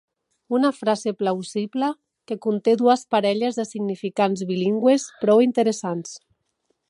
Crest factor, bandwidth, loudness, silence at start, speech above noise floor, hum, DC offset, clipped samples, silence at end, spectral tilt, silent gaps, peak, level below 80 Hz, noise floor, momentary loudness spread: 18 dB; 11.5 kHz; -22 LUFS; 0.5 s; 51 dB; none; under 0.1%; under 0.1%; 0.7 s; -5.5 dB/octave; none; -4 dBFS; -76 dBFS; -72 dBFS; 10 LU